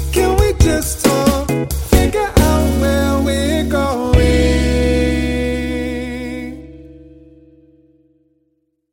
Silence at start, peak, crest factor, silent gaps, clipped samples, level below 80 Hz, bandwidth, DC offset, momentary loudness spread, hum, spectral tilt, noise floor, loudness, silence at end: 0 s; 0 dBFS; 16 dB; none; under 0.1%; -22 dBFS; 17 kHz; under 0.1%; 10 LU; none; -5.5 dB/octave; -65 dBFS; -15 LUFS; 1.9 s